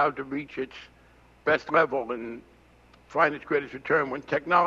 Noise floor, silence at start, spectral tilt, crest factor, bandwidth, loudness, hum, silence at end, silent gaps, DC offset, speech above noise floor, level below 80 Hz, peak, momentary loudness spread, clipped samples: -57 dBFS; 0 s; -6.5 dB/octave; 20 dB; 7.6 kHz; -27 LUFS; none; 0 s; none; under 0.1%; 30 dB; -62 dBFS; -8 dBFS; 13 LU; under 0.1%